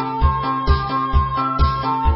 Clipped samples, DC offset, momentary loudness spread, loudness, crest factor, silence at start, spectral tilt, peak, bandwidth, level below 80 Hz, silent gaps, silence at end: under 0.1%; under 0.1%; 1 LU; -19 LUFS; 14 dB; 0 s; -11 dB/octave; -4 dBFS; 5.8 kHz; -22 dBFS; none; 0 s